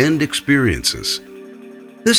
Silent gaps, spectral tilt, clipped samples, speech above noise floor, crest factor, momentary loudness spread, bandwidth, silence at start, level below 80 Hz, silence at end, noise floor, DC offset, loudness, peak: none; -3.5 dB/octave; under 0.1%; 21 dB; 16 dB; 22 LU; 17 kHz; 0 s; -40 dBFS; 0 s; -38 dBFS; under 0.1%; -18 LUFS; -2 dBFS